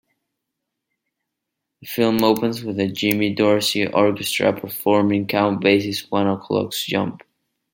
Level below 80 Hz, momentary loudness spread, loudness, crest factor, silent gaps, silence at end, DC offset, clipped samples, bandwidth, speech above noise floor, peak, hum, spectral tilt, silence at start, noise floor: -60 dBFS; 6 LU; -20 LUFS; 20 dB; none; 0.55 s; under 0.1%; under 0.1%; 17 kHz; 61 dB; -2 dBFS; none; -5 dB/octave; 1.8 s; -81 dBFS